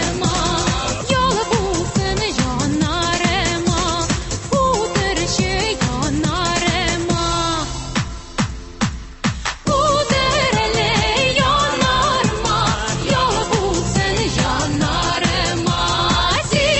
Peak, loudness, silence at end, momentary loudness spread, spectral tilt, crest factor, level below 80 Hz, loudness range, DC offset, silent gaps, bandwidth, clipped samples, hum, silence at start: -4 dBFS; -18 LUFS; 0 s; 7 LU; -4 dB/octave; 14 dB; -30 dBFS; 4 LU; under 0.1%; none; 8.6 kHz; under 0.1%; none; 0 s